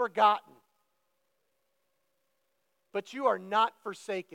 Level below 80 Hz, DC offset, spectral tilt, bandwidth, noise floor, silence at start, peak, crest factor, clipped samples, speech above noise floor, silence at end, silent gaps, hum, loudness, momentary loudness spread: under -90 dBFS; under 0.1%; -4 dB/octave; 15.5 kHz; -79 dBFS; 0 s; -10 dBFS; 22 dB; under 0.1%; 50 dB; 0.1 s; none; none; -30 LUFS; 13 LU